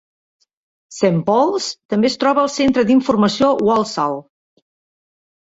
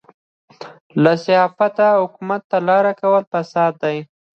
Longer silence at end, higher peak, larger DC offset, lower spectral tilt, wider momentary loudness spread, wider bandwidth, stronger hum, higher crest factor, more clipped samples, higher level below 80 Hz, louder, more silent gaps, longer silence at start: first, 1.2 s vs 0.3 s; about the same, -2 dBFS vs 0 dBFS; neither; second, -5.5 dB/octave vs -7 dB/octave; about the same, 8 LU vs 9 LU; first, 8 kHz vs 7 kHz; neither; about the same, 14 dB vs 18 dB; neither; first, -54 dBFS vs -70 dBFS; about the same, -16 LUFS vs -17 LUFS; second, 1.85-1.89 s vs 0.81-0.90 s, 2.44-2.50 s, 3.27-3.32 s; first, 0.9 s vs 0.6 s